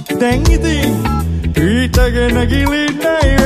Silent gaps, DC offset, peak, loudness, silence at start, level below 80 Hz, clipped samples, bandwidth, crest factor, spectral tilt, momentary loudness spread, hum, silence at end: none; under 0.1%; 0 dBFS; -14 LUFS; 0 s; -18 dBFS; under 0.1%; 15 kHz; 12 dB; -5.5 dB/octave; 4 LU; none; 0 s